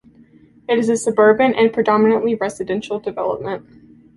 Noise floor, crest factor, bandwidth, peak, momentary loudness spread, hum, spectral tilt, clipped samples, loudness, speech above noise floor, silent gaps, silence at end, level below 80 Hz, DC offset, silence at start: -49 dBFS; 16 dB; 11.5 kHz; -2 dBFS; 12 LU; none; -5 dB/octave; under 0.1%; -17 LUFS; 32 dB; none; 0.55 s; -58 dBFS; under 0.1%; 0.7 s